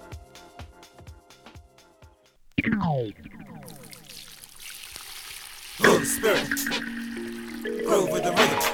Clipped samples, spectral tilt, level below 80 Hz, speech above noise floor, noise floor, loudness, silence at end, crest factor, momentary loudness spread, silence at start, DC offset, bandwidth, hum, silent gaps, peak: under 0.1%; -3.5 dB/octave; -54 dBFS; 31 dB; -56 dBFS; -25 LUFS; 0 s; 24 dB; 24 LU; 0 s; under 0.1%; over 20 kHz; none; none; -4 dBFS